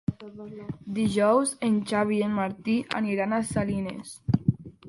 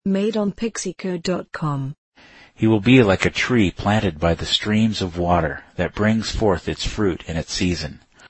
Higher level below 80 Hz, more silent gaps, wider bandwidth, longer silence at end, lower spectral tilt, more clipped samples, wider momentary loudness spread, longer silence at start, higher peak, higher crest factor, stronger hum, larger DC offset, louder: second, -52 dBFS vs -38 dBFS; second, none vs 1.98-2.12 s; first, 11.5 kHz vs 8.8 kHz; about the same, 0 s vs 0 s; about the same, -6 dB/octave vs -5.5 dB/octave; neither; first, 15 LU vs 10 LU; about the same, 0.1 s vs 0.05 s; second, -8 dBFS vs -2 dBFS; about the same, 18 dB vs 18 dB; neither; neither; second, -26 LUFS vs -20 LUFS